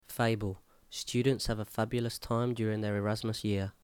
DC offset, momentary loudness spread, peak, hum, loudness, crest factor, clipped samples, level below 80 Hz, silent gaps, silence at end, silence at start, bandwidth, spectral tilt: under 0.1%; 8 LU; -18 dBFS; none; -33 LUFS; 16 dB; under 0.1%; -52 dBFS; none; 0.1 s; 0.1 s; 19 kHz; -5.5 dB/octave